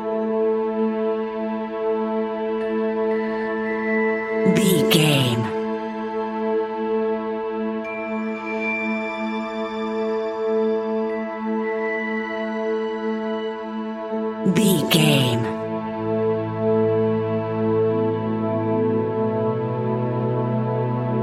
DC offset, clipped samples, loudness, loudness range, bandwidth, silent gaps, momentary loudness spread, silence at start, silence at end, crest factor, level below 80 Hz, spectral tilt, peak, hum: under 0.1%; under 0.1%; -22 LUFS; 5 LU; 16 kHz; none; 9 LU; 0 s; 0 s; 20 dB; -60 dBFS; -5.5 dB/octave; -2 dBFS; none